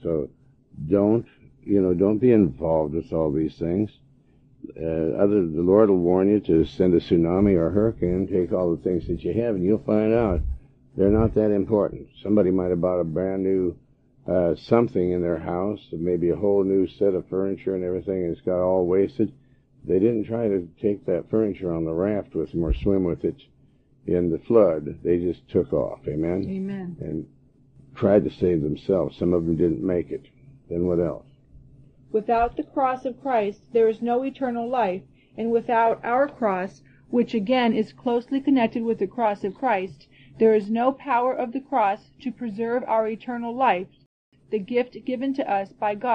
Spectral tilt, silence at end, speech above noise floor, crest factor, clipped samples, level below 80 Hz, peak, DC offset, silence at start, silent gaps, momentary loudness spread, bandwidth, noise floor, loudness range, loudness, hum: -9.5 dB/octave; 0 s; 36 dB; 18 dB; under 0.1%; -44 dBFS; -4 dBFS; under 0.1%; 0 s; 44.06-44.32 s; 9 LU; 6.2 kHz; -58 dBFS; 4 LU; -23 LUFS; none